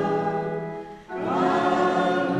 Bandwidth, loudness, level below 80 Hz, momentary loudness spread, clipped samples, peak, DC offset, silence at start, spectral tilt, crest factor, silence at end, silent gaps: 10.5 kHz; -24 LUFS; -60 dBFS; 13 LU; under 0.1%; -10 dBFS; under 0.1%; 0 s; -6.5 dB/octave; 14 dB; 0 s; none